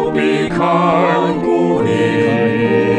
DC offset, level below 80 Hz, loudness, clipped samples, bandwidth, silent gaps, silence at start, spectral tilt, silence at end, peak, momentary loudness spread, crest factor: under 0.1%; -46 dBFS; -14 LUFS; under 0.1%; 10.5 kHz; none; 0 s; -7 dB/octave; 0 s; 0 dBFS; 3 LU; 12 dB